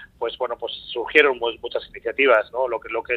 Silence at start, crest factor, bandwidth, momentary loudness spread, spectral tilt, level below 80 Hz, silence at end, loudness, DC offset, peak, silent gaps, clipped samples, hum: 0 s; 22 dB; 8 kHz; 13 LU; -4 dB/octave; -56 dBFS; 0 s; -21 LUFS; under 0.1%; 0 dBFS; none; under 0.1%; none